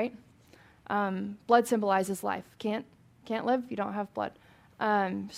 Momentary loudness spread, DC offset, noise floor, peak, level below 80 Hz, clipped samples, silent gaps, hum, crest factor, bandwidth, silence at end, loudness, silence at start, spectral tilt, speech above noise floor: 11 LU; under 0.1%; -58 dBFS; -8 dBFS; -72 dBFS; under 0.1%; none; none; 22 dB; 16 kHz; 0 s; -30 LUFS; 0 s; -5.5 dB/octave; 29 dB